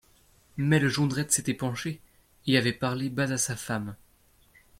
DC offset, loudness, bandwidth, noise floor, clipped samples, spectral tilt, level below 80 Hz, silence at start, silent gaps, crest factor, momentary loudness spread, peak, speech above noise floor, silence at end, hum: under 0.1%; -27 LUFS; 16.5 kHz; -62 dBFS; under 0.1%; -4 dB/octave; -60 dBFS; 0.55 s; none; 20 dB; 13 LU; -10 dBFS; 35 dB; 0.85 s; none